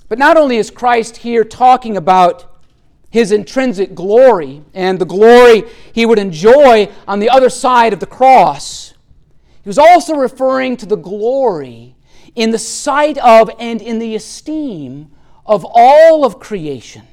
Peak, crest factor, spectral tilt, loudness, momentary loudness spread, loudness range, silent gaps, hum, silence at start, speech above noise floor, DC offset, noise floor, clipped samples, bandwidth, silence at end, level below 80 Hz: 0 dBFS; 10 dB; -4.5 dB/octave; -10 LUFS; 17 LU; 5 LU; none; none; 0.1 s; 35 dB; under 0.1%; -45 dBFS; under 0.1%; 14.5 kHz; 0.15 s; -44 dBFS